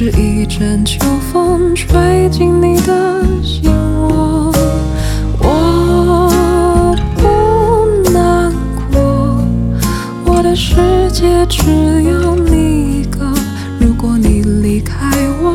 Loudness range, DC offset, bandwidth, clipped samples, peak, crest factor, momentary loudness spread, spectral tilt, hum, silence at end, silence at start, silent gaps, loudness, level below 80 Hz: 2 LU; under 0.1%; 17 kHz; under 0.1%; 0 dBFS; 10 dB; 5 LU; -6.5 dB/octave; none; 0 s; 0 s; none; -12 LUFS; -18 dBFS